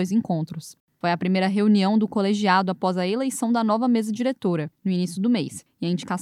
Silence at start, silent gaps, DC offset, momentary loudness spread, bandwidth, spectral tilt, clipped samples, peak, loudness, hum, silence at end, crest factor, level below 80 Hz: 0 s; 0.80-0.88 s; under 0.1%; 8 LU; 13.5 kHz; -6 dB/octave; under 0.1%; -6 dBFS; -23 LUFS; none; 0 s; 16 dB; -72 dBFS